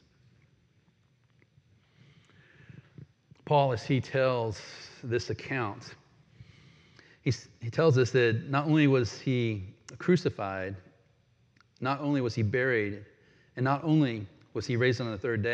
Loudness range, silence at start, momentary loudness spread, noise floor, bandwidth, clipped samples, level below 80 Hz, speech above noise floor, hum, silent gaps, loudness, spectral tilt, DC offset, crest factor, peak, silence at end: 7 LU; 2.75 s; 15 LU; -67 dBFS; 8.4 kHz; under 0.1%; -66 dBFS; 39 dB; none; none; -29 LUFS; -7 dB/octave; under 0.1%; 18 dB; -12 dBFS; 0 s